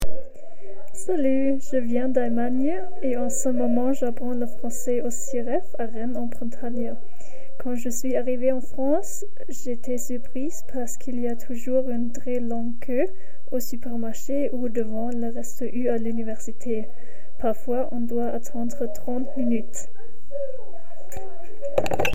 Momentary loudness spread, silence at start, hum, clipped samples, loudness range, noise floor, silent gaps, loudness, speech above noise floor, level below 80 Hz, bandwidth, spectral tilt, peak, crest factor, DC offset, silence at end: 14 LU; 0 s; none; under 0.1%; 5 LU; -45 dBFS; none; -28 LUFS; 18 dB; -46 dBFS; 16 kHz; -5.5 dB/octave; -4 dBFS; 20 dB; 10%; 0 s